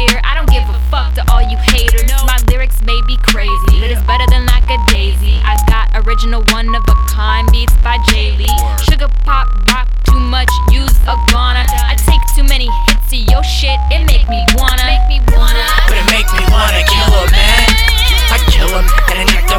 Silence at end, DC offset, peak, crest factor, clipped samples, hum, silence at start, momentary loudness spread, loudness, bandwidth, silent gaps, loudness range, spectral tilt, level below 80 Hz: 0 s; under 0.1%; 0 dBFS; 8 dB; 0.1%; none; 0 s; 4 LU; -11 LUFS; 19 kHz; none; 3 LU; -4 dB/octave; -10 dBFS